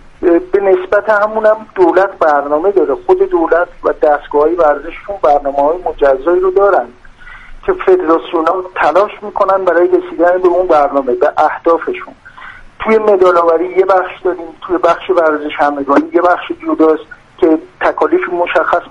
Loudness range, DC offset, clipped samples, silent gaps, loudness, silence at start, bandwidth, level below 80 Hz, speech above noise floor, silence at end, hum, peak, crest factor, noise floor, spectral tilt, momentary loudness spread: 2 LU; under 0.1%; under 0.1%; none; -12 LUFS; 0.2 s; 7.4 kHz; -40 dBFS; 22 dB; 0 s; none; 0 dBFS; 12 dB; -33 dBFS; -6 dB/octave; 6 LU